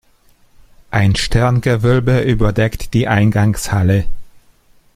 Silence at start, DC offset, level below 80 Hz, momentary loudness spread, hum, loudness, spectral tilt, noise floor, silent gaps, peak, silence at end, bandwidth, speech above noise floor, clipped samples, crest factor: 0.9 s; under 0.1%; -28 dBFS; 5 LU; none; -15 LUFS; -6.5 dB/octave; -51 dBFS; none; 0 dBFS; 0.65 s; 15 kHz; 38 dB; under 0.1%; 14 dB